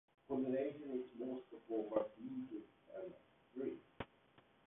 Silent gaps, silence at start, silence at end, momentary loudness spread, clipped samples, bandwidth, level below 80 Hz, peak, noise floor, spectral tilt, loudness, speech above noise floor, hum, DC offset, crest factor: none; 0.3 s; 0.25 s; 14 LU; under 0.1%; 3.8 kHz; -78 dBFS; -24 dBFS; -71 dBFS; -4.5 dB/octave; -46 LUFS; 27 dB; none; under 0.1%; 22 dB